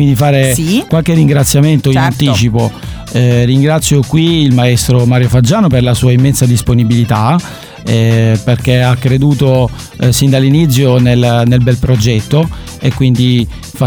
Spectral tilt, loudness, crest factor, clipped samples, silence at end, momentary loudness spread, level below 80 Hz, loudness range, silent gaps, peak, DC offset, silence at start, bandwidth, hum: -6 dB/octave; -10 LUFS; 8 dB; under 0.1%; 0 s; 6 LU; -30 dBFS; 1 LU; none; 0 dBFS; under 0.1%; 0 s; over 20 kHz; none